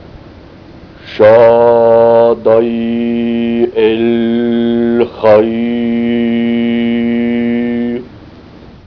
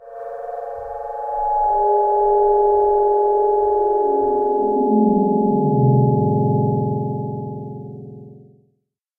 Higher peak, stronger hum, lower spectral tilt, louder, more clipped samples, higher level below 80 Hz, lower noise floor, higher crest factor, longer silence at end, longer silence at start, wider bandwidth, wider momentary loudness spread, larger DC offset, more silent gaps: first, 0 dBFS vs -6 dBFS; neither; second, -9 dB/octave vs -13 dB/octave; first, -11 LUFS vs -18 LUFS; first, 0.4% vs under 0.1%; about the same, -44 dBFS vs -46 dBFS; second, -35 dBFS vs -69 dBFS; about the same, 10 dB vs 14 dB; second, 0.3 s vs 0.8 s; first, 0.15 s vs 0 s; first, 5.4 kHz vs 1.9 kHz; second, 8 LU vs 14 LU; first, 0.1% vs under 0.1%; neither